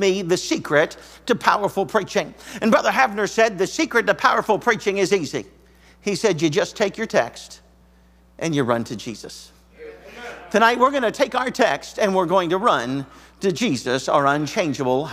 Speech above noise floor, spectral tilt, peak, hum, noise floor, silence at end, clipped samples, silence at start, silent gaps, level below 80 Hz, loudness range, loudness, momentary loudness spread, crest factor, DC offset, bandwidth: 33 dB; -4.5 dB/octave; 0 dBFS; none; -53 dBFS; 0 s; under 0.1%; 0 s; none; -54 dBFS; 5 LU; -20 LUFS; 14 LU; 22 dB; under 0.1%; 16 kHz